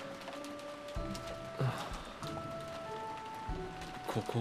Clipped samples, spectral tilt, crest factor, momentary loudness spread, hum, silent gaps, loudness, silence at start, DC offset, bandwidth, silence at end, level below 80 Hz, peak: under 0.1%; -5.5 dB/octave; 18 dB; 7 LU; none; none; -42 LUFS; 0 s; under 0.1%; 15.5 kHz; 0 s; -52 dBFS; -22 dBFS